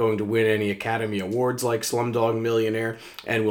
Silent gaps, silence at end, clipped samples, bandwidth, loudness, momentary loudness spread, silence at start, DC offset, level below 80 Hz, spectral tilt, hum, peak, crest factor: none; 0 s; under 0.1%; 18.5 kHz; -24 LUFS; 5 LU; 0 s; under 0.1%; -66 dBFS; -5 dB/octave; none; -8 dBFS; 16 dB